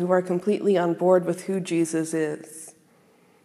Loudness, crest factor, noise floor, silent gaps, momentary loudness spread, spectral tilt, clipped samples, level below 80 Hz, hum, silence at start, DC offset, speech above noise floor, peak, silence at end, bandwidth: -24 LUFS; 18 dB; -58 dBFS; none; 17 LU; -6 dB/octave; under 0.1%; -82 dBFS; none; 0 s; under 0.1%; 35 dB; -6 dBFS; 0.75 s; 13.5 kHz